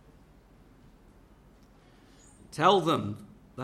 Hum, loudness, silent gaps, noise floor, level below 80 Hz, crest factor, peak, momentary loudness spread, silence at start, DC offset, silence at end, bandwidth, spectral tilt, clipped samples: none; -26 LUFS; none; -57 dBFS; -62 dBFS; 24 dB; -8 dBFS; 22 LU; 2.55 s; under 0.1%; 0 s; 14 kHz; -5.5 dB/octave; under 0.1%